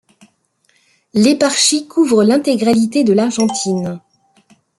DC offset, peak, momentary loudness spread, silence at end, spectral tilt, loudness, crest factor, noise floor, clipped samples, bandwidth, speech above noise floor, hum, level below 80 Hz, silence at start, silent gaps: under 0.1%; 0 dBFS; 9 LU; 0.8 s; -4 dB/octave; -14 LUFS; 16 dB; -60 dBFS; under 0.1%; 12 kHz; 47 dB; none; -60 dBFS; 1.15 s; none